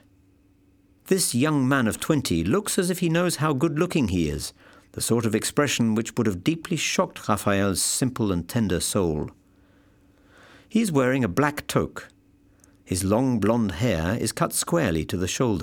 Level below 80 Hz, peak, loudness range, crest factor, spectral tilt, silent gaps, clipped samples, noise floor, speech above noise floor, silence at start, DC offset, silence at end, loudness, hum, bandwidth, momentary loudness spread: -48 dBFS; -6 dBFS; 3 LU; 20 dB; -4.5 dB/octave; none; under 0.1%; -59 dBFS; 36 dB; 1.05 s; under 0.1%; 0 s; -24 LUFS; none; 19 kHz; 5 LU